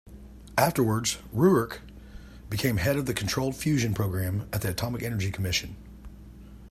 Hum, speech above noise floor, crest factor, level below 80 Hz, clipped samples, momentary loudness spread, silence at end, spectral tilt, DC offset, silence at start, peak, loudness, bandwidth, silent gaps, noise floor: none; 20 dB; 20 dB; -48 dBFS; under 0.1%; 24 LU; 0 s; -5 dB/octave; under 0.1%; 0.05 s; -8 dBFS; -27 LUFS; 16 kHz; none; -46 dBFS